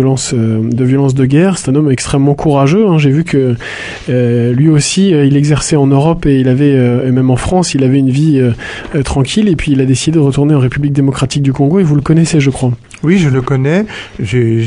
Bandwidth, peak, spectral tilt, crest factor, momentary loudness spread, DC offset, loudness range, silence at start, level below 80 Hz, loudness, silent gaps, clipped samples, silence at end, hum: 11 kHz; 0 dBFS; -6.5 dB/octave; 10 dB; 6 LU; under 0.1%; 2 LU; 0 s; -32 dBFS; -11 LUFS; none; under 0.1%; 0 s; none